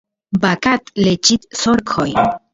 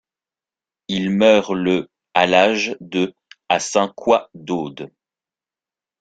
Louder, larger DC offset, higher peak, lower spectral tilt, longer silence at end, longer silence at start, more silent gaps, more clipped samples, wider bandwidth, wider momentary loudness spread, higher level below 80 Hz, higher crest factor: about the same, -16 LUFS vs -18 LUFS; neither; about the same, 0 dBFS vs 0 dBFS; about the same, -4 dB/octave vs -4.5 dB/octave; second, 0.15 s vs 1.15 s; second, 0.3 s vs 0.9 s; neither; neither; second, 7.8 kHz vs 9.2 kHz; second, 4 LU vs 12 LU; first, -46 dBFS vs -60 dBFS; about the same, 16 dB vs 20 dB